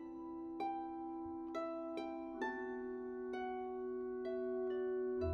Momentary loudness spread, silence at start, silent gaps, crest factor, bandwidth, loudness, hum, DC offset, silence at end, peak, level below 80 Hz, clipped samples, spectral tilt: 6 LU; 0 s; none; 14 dB; 6.6 kHz; -43 LUFS; none; under 0.1%; 0 s; -28 dBFS; -66 dBFS; under 0.1%; -8 dB/octave